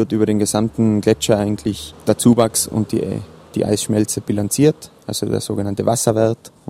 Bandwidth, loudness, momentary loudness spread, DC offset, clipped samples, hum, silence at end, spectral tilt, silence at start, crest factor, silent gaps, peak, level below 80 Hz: 16 kHz; -18 LUFS; 9 LU; under 0.1%; under 0.1%; none; 0.2 s; -5.5 dB/octave; 0 s; 18 dB; none; 0 dBFS; -46 dBFS